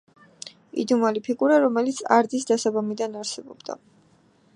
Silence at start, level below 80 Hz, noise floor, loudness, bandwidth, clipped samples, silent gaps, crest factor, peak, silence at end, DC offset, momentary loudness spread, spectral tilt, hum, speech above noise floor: 0.45 s; -78 dBFS; -59 dBFS; -23 LUFS; 11 kHz; under 0.1%; none; 22 dB; -2 dBFS; 0.8 s; under 0.1%; 19 LU; -4 dB/octave; none; 37 dB